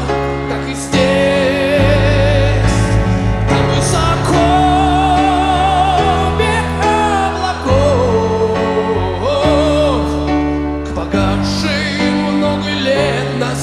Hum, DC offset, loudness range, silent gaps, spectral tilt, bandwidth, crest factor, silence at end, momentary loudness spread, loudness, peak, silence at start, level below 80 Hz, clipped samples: none; under 0.1%; 3 LU; none; -5.5 dB/octave; 13 kHz; 12 dB; 0 s; 5 LU; -14 LUFS; -2 dBFS; 0 s; -24 dBFS; under 0.1%